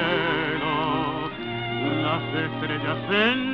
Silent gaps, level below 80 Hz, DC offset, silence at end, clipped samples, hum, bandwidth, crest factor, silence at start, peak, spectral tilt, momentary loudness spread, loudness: none; -54 dBFS; 0.2%; 0 s; under 0.1%; none; 6.4 kHz; 16 dB; 0 s; -8 dBFS; -7.5 dB/octave; 7 LU; -25 LUFS